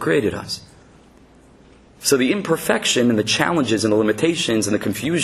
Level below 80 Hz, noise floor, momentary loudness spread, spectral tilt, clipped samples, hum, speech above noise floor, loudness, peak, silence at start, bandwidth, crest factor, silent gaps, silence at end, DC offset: -54 dBFS; -49 dBFS; 7 LU; -4 dB/octave; under 0.1%; none; 30 dB; -19 LUFS; -2 dBFS; 0 s; 13.5 kHz; 18 dB; none; 0 s; under 0.1%